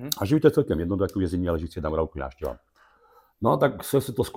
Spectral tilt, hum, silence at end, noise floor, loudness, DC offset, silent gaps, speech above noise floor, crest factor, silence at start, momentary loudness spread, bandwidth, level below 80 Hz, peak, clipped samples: -6.5 dB/octave; none; 0.05 s; -59 dBFS; -25 LUFS; under 0.1%; none; 34 dB; 20 dB; 0 s; 13 LU; 17 kHz; -44 dBFS; -4 dBFS; under 0.1%